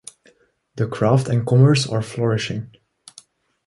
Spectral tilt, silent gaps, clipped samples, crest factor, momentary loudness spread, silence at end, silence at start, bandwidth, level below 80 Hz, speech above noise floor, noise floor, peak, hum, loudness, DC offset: -6.5 dB/octave; none; under 0.1%; 18 dB; 16 LU; 1 s; 0.75 s; 11.5 kHz; -54 dBFS; 40 dB; -58 dBFS; -2 dBFS; none; -19 LUFS; under 0.1%